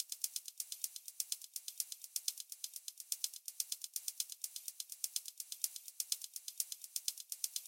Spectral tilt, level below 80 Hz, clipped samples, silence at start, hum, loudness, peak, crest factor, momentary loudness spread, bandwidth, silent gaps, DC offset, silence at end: 9 dB/octave; under -90 dBFS; under 0.1%; 0 s; none; -42 LUFS; -16 dBFS; 30 dB; 5 LU; 17 kHz; none; under 0.1%; 0 s